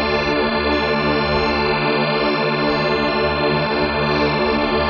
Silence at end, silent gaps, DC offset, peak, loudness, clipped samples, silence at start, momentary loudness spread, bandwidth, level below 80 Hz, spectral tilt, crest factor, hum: 0 s; none; under 0.1%; -6 dBFS; -18 LUFS; under 0.1%; 0 s; 1 LU; 7 kHz; -36 dBFS; -3 dB/octave; 12 dB; none